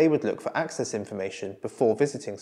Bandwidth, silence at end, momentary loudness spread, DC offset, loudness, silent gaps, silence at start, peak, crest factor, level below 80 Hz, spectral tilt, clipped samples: 11.5 kHz; 0 s; 10 LU; under 0.1%; -28 LUFS; none; 0 s; -8 dBFS; 18 dB; -78 dBFS; -5.5 dB/octave; under 0.1%